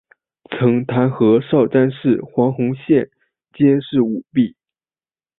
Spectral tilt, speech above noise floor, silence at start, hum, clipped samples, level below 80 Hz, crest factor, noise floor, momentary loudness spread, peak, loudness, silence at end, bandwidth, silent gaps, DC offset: -13 dB/octave; over 74 dB; 0.5 s; none; under 0.1%; -58 dBFS; 16 dB; under -90 dBFS; 5 LU; -2 dBFS; -17 LUFS; 0.9 s; 4 kHz; none; under 0.1%